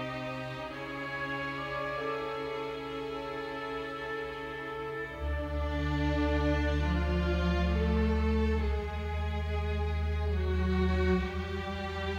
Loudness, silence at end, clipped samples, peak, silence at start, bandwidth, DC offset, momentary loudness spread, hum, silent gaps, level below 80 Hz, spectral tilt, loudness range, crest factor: -33 LUFS; 0 s; under 0.1%; -18 dBFS; 0 s; 7.2 kHz; under 0.1%; 8 LU; none; none; -36 dBFS; -7.5 dB/octave; 7 LU; 14 dB